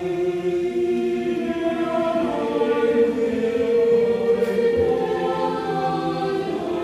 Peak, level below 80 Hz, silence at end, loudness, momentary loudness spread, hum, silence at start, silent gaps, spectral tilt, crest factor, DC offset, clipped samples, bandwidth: -8 dBFS; -54 dBFS; 0 s; -21 LUFS; 5 LU; none; 0 s; none; -6.5 dB/octave; 14 dB; under 0.1%; under 0.1%; 12.5 kHz